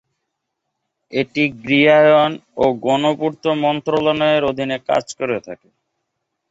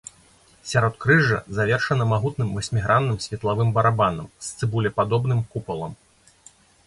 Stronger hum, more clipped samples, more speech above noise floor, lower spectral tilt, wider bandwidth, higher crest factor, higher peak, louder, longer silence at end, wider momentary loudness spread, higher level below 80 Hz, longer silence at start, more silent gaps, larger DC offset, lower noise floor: neither; neither; first, 60 dB vs 33 dB; about the same, -5.5 dB/octave vs -6 dB/octave; second, 8 kHz vs 11.5 kHz; about the same, 16 dB vs 18 dB; about the same, -2 dBFS vs -4 dBFS; first, -17 LUFS vs -22 LUFS; about the same, 0.95 s vs 0.95 s; about the same, 12 LU vs 13 LU; second, -56 dBFS vs -48 dBFS; first, 1.1 s vs 0.65 s; neither; neither; first, -77 dBFS vs -55 dBFS